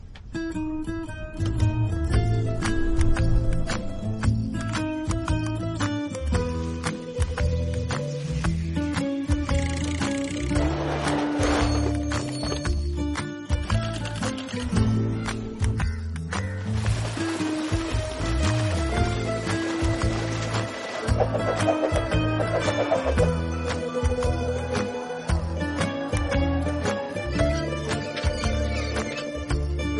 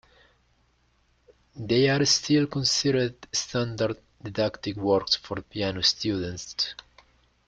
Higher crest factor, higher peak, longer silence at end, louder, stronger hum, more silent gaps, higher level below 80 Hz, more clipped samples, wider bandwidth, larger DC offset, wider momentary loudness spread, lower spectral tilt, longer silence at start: second, 16 dB vs 22 dB; about the same, -8 dBFS vs -6 dBFS; second, 0 s vs 0.75 s; about the same, -26 LUFS vs -25 LUFS; neither; neither; first, -32 dBFS vs -58 dBFS; neither; about the same, 11.5 kHz vs 11 kHz; neither; second, 6 LU vs 11 LU; first, -6 dB/octave vs -4 dB/octave; second, 0.05 s vs 1.55 s